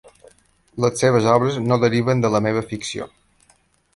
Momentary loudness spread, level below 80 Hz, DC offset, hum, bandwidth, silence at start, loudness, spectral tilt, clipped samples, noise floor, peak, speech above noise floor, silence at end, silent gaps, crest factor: 13 LU; -54 dBFS; under 0.1%; none; 11.5 kHz; 0.75 s; -19 LUFS; -6 dB/octave; under 0.1%; -59 dBFS; -2 dBFS; 41 dB; 0.9 s; none; 18 dB